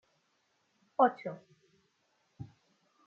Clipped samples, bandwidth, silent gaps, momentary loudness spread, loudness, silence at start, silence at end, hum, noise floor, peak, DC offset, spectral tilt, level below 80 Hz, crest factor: under 0.1%; 6.8 kHz; none; 23 LU; -31 LUFS; 1 s; 0.65 s; none; -76 dBFS; -14 dBFS; under 0.1%; -5 dB/octave; -78 dBFS; 24 dB